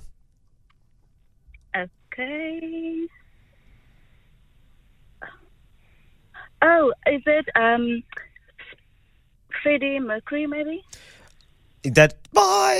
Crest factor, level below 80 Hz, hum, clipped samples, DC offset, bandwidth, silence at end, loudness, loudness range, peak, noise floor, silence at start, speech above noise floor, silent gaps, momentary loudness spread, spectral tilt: 24 dB; -54 dBFS; none; under 0.1%; under 0.1%; 15.5 kHz; 0 s; -22 LUFS; 12 LU; 0 dBFS; -59 dBFS; 0 s; 37 dB; none; 24 LU; -4.5 dB/octave